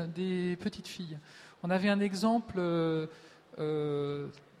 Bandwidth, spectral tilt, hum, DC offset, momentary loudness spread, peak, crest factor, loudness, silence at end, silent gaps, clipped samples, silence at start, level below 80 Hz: 13.5 kHz; -6.5 dB/octave; none; under 0.1%; 15 LU; -18 dBFS; 16 dB; -33 LUFS; 0.2 s; none; under 0.1%; 0 s; -68 dBFS